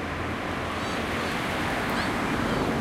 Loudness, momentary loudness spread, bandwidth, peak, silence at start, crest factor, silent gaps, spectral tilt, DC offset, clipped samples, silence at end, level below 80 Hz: -28 LUFS; 4 LU; 16 kHz; -12 dBFS; 0 s; 16 dB; none; -5 dB/octave; under 0.1%; under 0.1%; 0 s; -44 dBFS